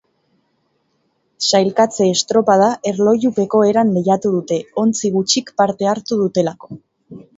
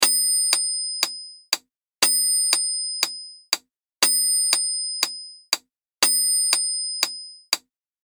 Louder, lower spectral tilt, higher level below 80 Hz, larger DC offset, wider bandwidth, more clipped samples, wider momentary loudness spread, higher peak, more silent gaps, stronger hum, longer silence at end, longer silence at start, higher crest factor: first, -16 LUFS vs -20 LUFS; first, -4.5 dB/octave vs 3.5 dB/octave; first, -62 dBFS vs -78 dBFS; neither; second, 8 kHz vs over 20 kHz; neither; second, 6 LU vs 10 LU; about the same, 0 dBFS vs 0 dBFS; neither; neither; second, 0.2 s vs 0.5 s; first, 1.4 s vs 0 s; second, 16 dB vs 24 dB